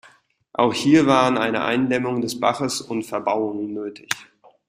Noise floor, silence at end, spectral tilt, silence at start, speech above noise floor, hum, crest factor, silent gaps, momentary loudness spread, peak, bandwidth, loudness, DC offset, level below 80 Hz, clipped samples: -55 dBFS; 0.45 s; -4.5 dB/octave; 0.6 s; 34 dB; none; 20 dB; none; 13 LU; -2 dBFS; 16 kHz; -21 LUFS; under 0.1%; -60 dBFS; under 0.1%